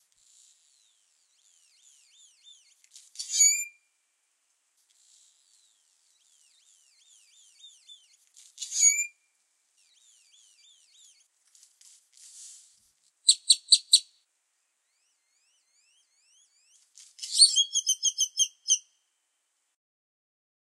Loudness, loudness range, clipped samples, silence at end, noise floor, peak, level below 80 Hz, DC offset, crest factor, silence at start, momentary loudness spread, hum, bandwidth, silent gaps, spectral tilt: -22 LUFS; 5 LU; under 0.1%; 1.95 s; -77 dBFS; -4 dBFS; under -90 dBFS; under 0.1%; 28 dB; 3.2 s; 22 LU; none; 14.5 kHz; none; 11 dB/octave